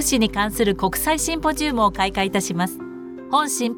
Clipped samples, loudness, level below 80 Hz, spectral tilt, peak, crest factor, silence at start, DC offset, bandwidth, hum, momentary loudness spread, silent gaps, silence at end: under 0.1%; -21 LUFS; -40 dBFS; -3.5 dB/octave; -6 dBFS; 16 dB; 0 s; under 0.1%; 19.5 kHz; none; 7 LU; none; 0 s